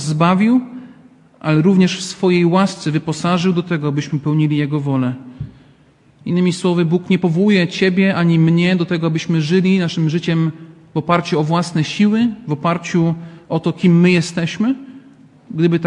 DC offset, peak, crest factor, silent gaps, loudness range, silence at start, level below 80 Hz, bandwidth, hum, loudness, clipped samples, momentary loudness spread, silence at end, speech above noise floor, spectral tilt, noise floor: under 0.1%; 0 dBFS; 16 dB; none; 4 LU; 0 s; -56 dBFS; 10.5 kHz; none; -16 LUFS; under 0.1%; 9 LU; 0 s; 35 dB; -6.5 dB/octave; -51 dBFS